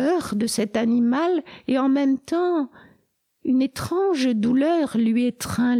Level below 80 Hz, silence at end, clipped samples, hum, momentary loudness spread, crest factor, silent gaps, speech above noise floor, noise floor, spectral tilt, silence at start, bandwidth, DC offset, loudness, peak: -58 dBFS; 0 s; under 0.1%; none; 5 LU; 12 dB; none; 46 dB; -67 dBFS; -5 dB/octave; 0 s; 15.5 kHz; under 0.1%; -22 LUFS; -10 dBFS